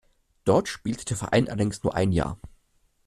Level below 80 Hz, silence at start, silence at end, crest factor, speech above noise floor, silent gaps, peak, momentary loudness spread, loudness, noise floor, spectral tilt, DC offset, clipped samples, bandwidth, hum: -46 dBFS; 0.45 s; 0.6 s; 18 dB; 41 dB; none; -8 dBFS; 8 LU; -26 LUFS; -66 dBFS; -6 dB/octave; under 0.1%; under 0.1%; 13.5 kHz; none